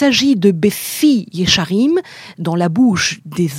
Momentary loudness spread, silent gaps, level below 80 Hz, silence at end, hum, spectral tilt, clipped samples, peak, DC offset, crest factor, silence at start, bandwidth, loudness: 7 LU; none; -46 dBFS; 0 s; none; -4.5 dB/octave; under 0.1%; 0 dBFS; under 0.1%; 14 dB; 0 s; 16.5 kHz; -15 LUFS